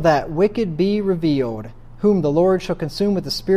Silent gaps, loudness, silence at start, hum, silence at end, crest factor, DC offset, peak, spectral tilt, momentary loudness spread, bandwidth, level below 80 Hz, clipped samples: none; -19 LUFS; 0 s; none; 0 s; 16 dB; under 0.1%; -4 dBFS; -7 dB/octave; 8 LU; 15 kHz; -44 dBFS; under 0.1%